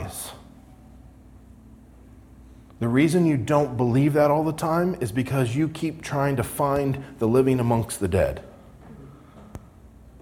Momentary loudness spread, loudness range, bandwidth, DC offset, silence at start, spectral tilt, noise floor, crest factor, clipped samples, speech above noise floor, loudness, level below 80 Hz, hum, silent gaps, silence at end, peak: 16 LU; 4 LU; 18 kHz; under 0.1%; 0 s; -7 dB/octave; -48 dBFS; 18 dB; under 0.1%; 26 dB; -23 LUFS; -48 dBFS; none; none; 0.05 s; -6 dBFS